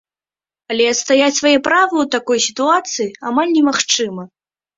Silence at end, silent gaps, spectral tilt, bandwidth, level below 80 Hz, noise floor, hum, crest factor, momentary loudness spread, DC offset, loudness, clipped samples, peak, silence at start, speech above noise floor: 0.5 s; none; -2 dB/octave; 7.8 kHz; -62 dBFS; under -90 dBFS; none; 16 dB; 9 LU; under 0.1%; -15 LUFS; under 0.1%; -2 dBFS; 0.7 s; over 75 dB